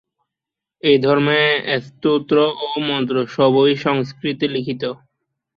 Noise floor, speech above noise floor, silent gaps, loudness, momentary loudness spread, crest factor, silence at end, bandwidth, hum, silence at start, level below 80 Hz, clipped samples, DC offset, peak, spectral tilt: -85 dBFS; 68 dB; none; -18 LUFS; 9 LU; 16 dB; 0.65 s; 6.8 kHz; none; 0.85 s; -62 dBFS; under 0.1%; under 0.1%; -2 dBFS; -7 dB/octave